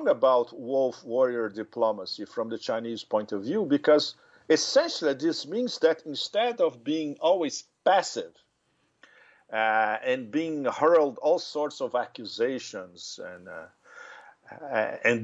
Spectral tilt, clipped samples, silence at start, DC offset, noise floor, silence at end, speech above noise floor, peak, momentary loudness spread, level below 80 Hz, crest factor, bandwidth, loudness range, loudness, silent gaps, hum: -3.5 dB/octave; under 0.1%; 0 s; under 0.1%; -72 dBFS; 0 s; 45 dB; -10 dBFS; 16 LU; -82 dBFS; 18 dB; 8.2 kHz; 5 LU; -27 LUFS; none; none